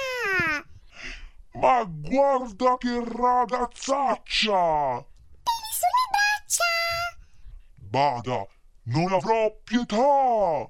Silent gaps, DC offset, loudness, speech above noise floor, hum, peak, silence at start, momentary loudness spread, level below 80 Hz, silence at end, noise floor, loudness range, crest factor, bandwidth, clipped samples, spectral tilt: none; under 0.1%; -24 LUFS; 21 dB; none; -6 dBFS; 0 s; 11 LU; -50 dBFS; 0 s; -44 dBFS; 2 LU; 18 dB; 16 kHz; under 0.1%; -3.5 dB/octave